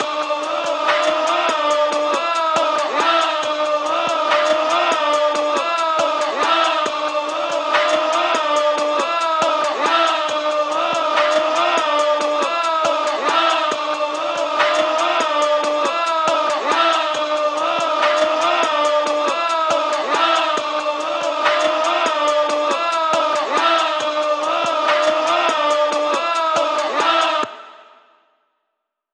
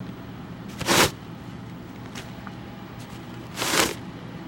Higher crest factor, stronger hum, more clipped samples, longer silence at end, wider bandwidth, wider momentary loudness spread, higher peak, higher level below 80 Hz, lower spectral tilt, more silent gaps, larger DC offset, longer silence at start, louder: second, 14 dB vs 26 dB; neither; neither; first, 1.35 s vs 0 s; second, 10.5 kHz vs 16.5 kHz; second, 4 LU vs 19 LU; about the same, -4 dBFS vs -2 dBFS; second, -86 dBFS vs -52 dBFS; second, -1 dB/octave vs -2.5 dB/octave; neither; neither; about the same, 0 s vs 0 s; first, -17 LUFS vs -23 LUFS